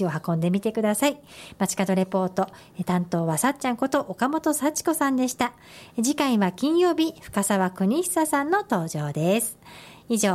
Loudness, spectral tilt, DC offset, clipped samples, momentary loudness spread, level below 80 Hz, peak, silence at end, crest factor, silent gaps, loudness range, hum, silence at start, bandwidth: -24 LUFS; -5 dB/octave; under 0.1%; under 0.1%; 7 LU; -62 dBFS; -10 dBFS; 0 s; 14 dB; none; 2 LU; none; 0 s; 16 kHz